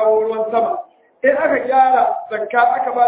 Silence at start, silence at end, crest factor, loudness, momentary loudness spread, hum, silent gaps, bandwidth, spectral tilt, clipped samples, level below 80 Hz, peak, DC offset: 0 s; 0 s; 14 dB; -16 LUFS; 7 LU; none; none; 4 kHz; -7.5 dB/octave; under 0.1%; -62 dBFS; -2 dBFS; under 0.1%